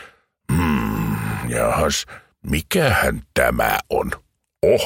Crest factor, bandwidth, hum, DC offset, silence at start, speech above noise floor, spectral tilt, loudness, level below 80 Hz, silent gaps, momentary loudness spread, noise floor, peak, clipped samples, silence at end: 18 dB; 16.5 kHz; none; under 0.1%; 0 s; 22 dB; -4.5 dB/octave; -20 LUFS; -34 dBFS; none; 7 LU; -42 dBFS; -2 dBFS; under 0.1%; 0 s